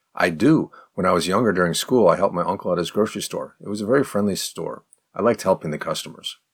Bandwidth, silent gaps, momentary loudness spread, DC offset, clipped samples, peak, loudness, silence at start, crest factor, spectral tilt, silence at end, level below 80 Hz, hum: 19 kHz; none; 14 LU; under 0.1%; under 0.1%; -4 dBFS; -21 LUFS; 0.15 s; 18 dB; -5 dB/octave; 0.2 s; -60 dBFS; none